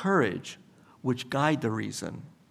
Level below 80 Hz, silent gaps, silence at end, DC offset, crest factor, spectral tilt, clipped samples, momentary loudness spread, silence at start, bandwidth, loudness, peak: -72 dBFS; none; 0.2 s; under 0.1%; 20 dB; -5.5 dB/octave; under 0.1%; 18 LU; 0 s; 15 kHz; -30 LUFS; -10 dBFS